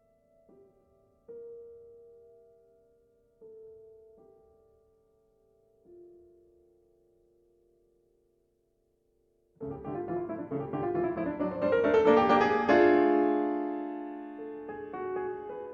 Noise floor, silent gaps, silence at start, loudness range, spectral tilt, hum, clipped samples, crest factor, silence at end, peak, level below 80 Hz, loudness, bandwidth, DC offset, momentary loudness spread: -73 dBFS; none; 1.3 s; 17 LU; -7.5 dB/octave; none; under 0.1%; 22 dB; 0 s; -10 dBFS; -64 dBFS; -28 LUFS; 7.2 kHz; under 0.1%; 25 LU